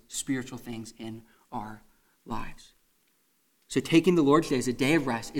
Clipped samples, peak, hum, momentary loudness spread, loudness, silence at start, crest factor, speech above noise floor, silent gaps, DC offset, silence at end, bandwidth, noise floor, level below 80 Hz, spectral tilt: under 0.1%; -8 dBFS; none; 20 LU; -26 LUFS; 0.1 s; 20 dB; 43 dB; none; under 0.1%; 0 s; 16.5 kHz; -70 dBFS; -50 dBFS; -5 dB/octave